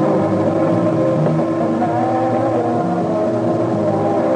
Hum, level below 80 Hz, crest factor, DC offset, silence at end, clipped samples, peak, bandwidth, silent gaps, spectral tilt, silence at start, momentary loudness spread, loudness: none; -54 dBFS; 12 dB; under 0.1%; 0 s; under 0.1%; -4 dBFS; 9.4 kHz; none; -9 dB/octave; 0 s; 2 LU; -17 LUFS